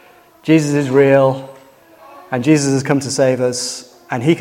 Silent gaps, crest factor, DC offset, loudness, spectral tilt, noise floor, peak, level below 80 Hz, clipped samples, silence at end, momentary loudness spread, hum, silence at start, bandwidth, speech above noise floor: none; 16 dB; under 0.1%; -15 LUFS; -5.5 dB/octave; -44 dBFS; 0 dBFS; -60 dBFS; under 0.1%; 0 s; 13 LU; none; 0.45 s; 16 kHz; 30 dB